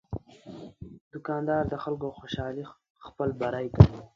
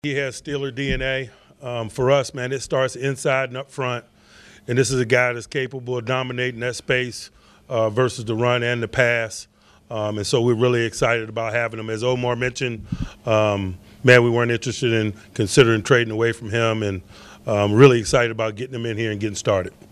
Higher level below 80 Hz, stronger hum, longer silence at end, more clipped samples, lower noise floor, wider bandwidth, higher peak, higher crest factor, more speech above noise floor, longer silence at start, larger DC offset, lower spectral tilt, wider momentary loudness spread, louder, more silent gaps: first, -40 dBFS vs -46 dBFS; neither; second, 0.1 s vs 0.25 s; neither; about the same, -46 dBFS vs -48 dBFS; second, 6.8 kHz vs 13 kHz; about the same, 0 dBFS vs 0 dBFS; first, 28 dB vs 20 dB; second, 20 dB vs 28 dB; about the same, 0.1 s vs 0.05 s; neither; first, -9 dB/octave vs -5 dB/octave; first, 25 LU vs 13 LU; second, -28 LUFS vs -21 LUFS; first, 1.01-1.11 s, 2.90-2.95 s vs none